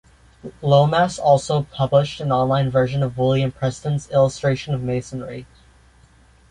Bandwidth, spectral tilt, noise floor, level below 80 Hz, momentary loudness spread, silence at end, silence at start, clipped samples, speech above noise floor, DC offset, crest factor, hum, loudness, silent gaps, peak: 11 kHz; -6.5 dB/octave; -52 dBFS; -48 dBFS; 14 LU; 1.05 s; 0.45 s; under 0.1%; 33 dB; under 0.1%; 18 dB; none; -19 LUFS; none; -2 dBFS